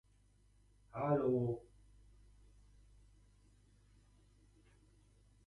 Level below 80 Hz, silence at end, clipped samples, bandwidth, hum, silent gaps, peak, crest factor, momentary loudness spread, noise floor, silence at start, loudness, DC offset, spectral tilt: -68 dBFS; 3.9 s; under 0.1%; 11 kHz; 50 Hz at -65 dBFS; none; -22 dBFS; 22 dB; 14 LU; -70 dBFS; 0.95 s; -38 LUFS; under 0.1%; -10 dB/octave